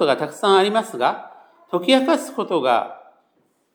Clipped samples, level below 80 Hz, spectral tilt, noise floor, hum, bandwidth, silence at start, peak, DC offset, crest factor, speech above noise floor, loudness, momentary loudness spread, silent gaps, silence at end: under 0.1%; -82 dBFS; -4 dB/octave; -65 dBFS; none; over 20 kHz; 0 s; -2 dBFS; under 0.1%; 18 dB; 46 dB; -19 LUFS; 9 LU; none; 0.75 s